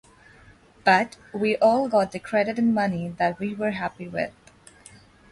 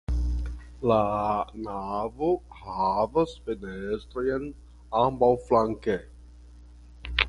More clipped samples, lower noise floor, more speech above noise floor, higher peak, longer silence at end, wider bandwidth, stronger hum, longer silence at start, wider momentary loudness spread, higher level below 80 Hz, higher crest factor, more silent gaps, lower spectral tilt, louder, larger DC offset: neither; first, -53 dBFS vs -48 dBFS; first, 29 dB vs 22 dB; second, -6 dBFS vs -2 dBFS; first, 1 s vs 0 s; about the same, 11.5 kHz vs 11 kHz; neither; first, 0.85 s vs 0.1 s; about the same, 10 LU vs 11 LU; second, -60 dBFS vs -38 dBFS; second, 18 dB vs 26 dB; neither; about the same, -6 dB/octave vs -7 dB/octave; first, -24 LUFS vs -27 LUFS; neither